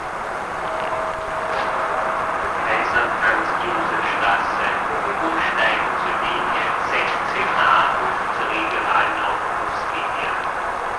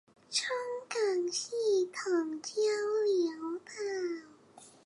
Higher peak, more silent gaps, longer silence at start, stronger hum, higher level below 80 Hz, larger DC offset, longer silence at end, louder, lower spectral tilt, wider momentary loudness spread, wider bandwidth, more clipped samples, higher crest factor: first, -4 dBFS vs -18 dBFS; neither; second, 0 s vs 0.3 s; neither; first, -48 dBFS vs -86 dBFS; neither; second, 0 s vs 0.15 s; first, -20 LUFS vs -33 LUFS; first, -3.5 dB/octave vs -1.5 dB/octave; about the same, 6 LU vs 8 LU; about the same, 11 kHz vs 11.5 kHz; neither; about the same, 16 dB vs 16 dB